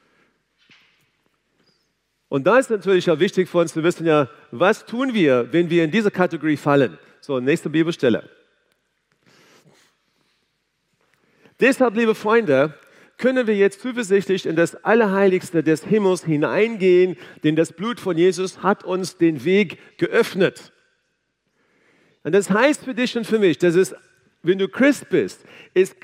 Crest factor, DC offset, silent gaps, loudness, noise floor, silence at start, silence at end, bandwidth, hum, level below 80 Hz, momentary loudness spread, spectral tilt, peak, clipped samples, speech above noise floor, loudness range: 20 dB; under 0.1%; none; -19 LUFS; -71 dBFS; 2.3 s; 0.15 s; 15 kHz; none; -76 dBFS; 7 LU; -6 dB/octave; 0 dBFS; under 0.1%; 53 dB; 5 LU